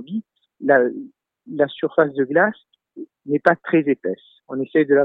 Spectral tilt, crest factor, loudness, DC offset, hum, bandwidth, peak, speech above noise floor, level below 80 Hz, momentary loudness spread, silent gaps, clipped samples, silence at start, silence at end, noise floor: -9 dB/octave; 20 dB; -20 LUFS; under 0.1%; none; 5 kHz; -2 dBFS; 20 dB; -74 dBFS; 17 LU; none; under 0.1%; 0 s; 0 s; -40 dBFS